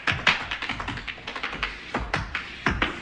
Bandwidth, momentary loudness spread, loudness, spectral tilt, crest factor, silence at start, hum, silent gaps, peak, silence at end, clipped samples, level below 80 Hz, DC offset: 10.5 kHz; 10 LU; -28 LUFS; -4 dB/octave; 24 dB; 0 s; none; none; -4 dBFS; 0 s; under 0.1%; -42 dBFS; under 0.1%